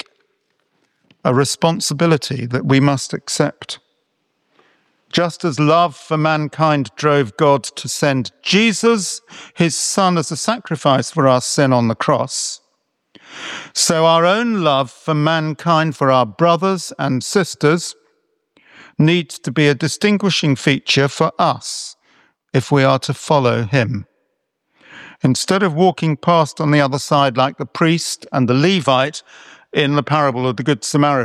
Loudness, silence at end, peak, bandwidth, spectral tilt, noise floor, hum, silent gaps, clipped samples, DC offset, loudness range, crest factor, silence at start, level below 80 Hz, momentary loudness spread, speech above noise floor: -16 LUFS; 0 s; -2 dBFS; 14 kHz; -5 dB/octave; -70 dBFS; none; none; under 0.1%; under 0.1%; 3 LU; 16 dB; 1.25 s; -62 dBFS; 8 LU; 54 dB